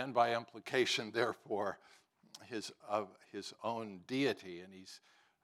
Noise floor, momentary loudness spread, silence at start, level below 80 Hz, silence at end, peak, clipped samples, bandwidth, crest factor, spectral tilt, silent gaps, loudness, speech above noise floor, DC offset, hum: -60 dBFS; 20 LU; 0 s; under -90 dBFS; 0.45 s; -18 dBFS; under 0.1%; 15 kHz; 22 dB; -4 dB/octave; none; -38 LUFS; 22 dB; under 0.1%; none